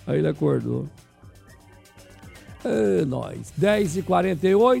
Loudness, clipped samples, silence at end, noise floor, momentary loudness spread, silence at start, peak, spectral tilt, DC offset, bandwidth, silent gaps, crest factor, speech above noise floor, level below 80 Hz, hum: -23 LUFS; under 0.1%; 0 s; -50 dBFS; 13 LU; 0.05 s; -6 dBFS; -7 dB/octave; under 0.1%; 16 kHz; none; 16 dB; 28 dB; -52 dBFS; none